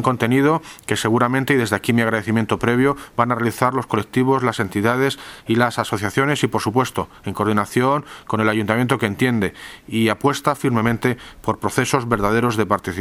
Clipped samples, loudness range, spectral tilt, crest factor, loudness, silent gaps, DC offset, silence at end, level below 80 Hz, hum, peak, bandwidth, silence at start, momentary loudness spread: under 0.1%; 2 LU; -5.5 dB/octave; 20 dB; -19 LUFS; none; under 0.1%; 0 s; -48 dBFS; none; 0 dBFS; 17 kHz; 0 s; 6 LU